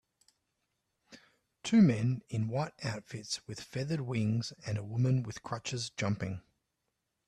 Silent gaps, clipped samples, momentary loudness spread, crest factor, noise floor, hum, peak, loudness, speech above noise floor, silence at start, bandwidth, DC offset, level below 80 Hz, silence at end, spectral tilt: none; under 0.1%; 14 LU; 20 dB; -84 dBFS; none; -14 dBFS; -33 LUFS; 52 dB; 1.1 s; 11.5 kHz; under 0.1%; -68 dBFS; 0.85 s; -6 dB/octave